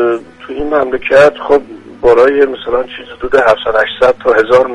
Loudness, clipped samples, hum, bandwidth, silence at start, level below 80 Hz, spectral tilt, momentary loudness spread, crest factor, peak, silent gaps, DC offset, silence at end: -11 LUFS; 0.3%; none; 10.5 kHz; 0 s; -38 dBFS; -5 dB/octave; 12 LU; 10 dB; 0 dBFS; none; under 0.1%; 0 s